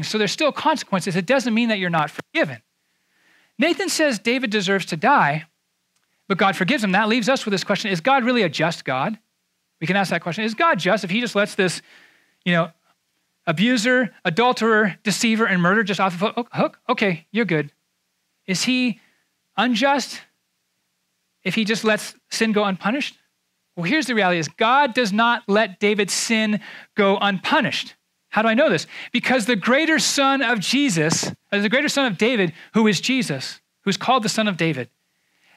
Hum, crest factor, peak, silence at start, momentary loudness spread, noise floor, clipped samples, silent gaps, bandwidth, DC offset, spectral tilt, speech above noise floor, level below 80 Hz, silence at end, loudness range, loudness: none; 18 dB; -4 dBFS; 0 s; 9 LU; -72 dBFS; under 0.1%; none; 15 kHz; under 0.1%; -4 dB/octave; 52 dB; -74 dBFS; 0.7 s; 5 LU; -20 LUFS